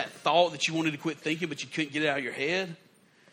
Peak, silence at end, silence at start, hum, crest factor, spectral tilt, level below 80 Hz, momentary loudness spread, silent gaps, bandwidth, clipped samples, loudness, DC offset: -10 dBFS; 0.6 s; 0 s; none; 20 dB; -4 dB/octave; -76 dBFS; 8 LU; none; 15.5 kHz; under 0.1%; -29 LUFS; under 0.1%